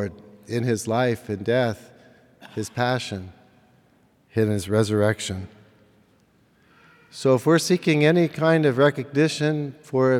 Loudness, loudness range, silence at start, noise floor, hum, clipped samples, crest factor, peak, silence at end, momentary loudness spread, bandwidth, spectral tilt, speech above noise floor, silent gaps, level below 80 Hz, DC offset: -22 LUFS; 7 LU; 0 s; -60 dBFS; none; under 0.1%; 18 dB; -4 dBFS; 0 s; 14 LU; 16 kHz; -6 dB/octave; 39 dB; none; -66 dBFS; under 0.1%